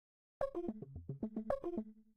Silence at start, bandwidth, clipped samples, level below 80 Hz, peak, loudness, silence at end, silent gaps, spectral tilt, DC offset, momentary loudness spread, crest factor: 0.4 s; 10 kHz; under 0.1%; -62 dBFS; -22 dBFS; -44 LUFS; 0 s; none; -9.5 dB/octave; under 0.1%; 7 LU; 20 dB